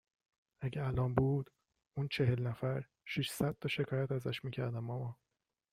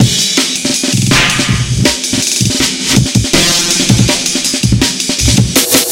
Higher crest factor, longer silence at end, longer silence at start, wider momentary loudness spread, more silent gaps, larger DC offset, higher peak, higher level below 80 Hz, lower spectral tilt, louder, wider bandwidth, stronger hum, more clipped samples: first, 22 dB vs 10 dB; first, 0.6 s vs 0 s; first, 0.6 s vs 0 s; first, 9 LU vs 3 LU; neither; neither; second, -16 dBFS vs 0 dBFS; second, -60 dBFS vs -26 dBFS; first, -6.5 dB/octave vs -3 dB/octave; second, -37 LUFS vs -10 LUFS; about the same, 16 kHz vs 17.5 kHz; neither; second, under 0.1% vs 0.4%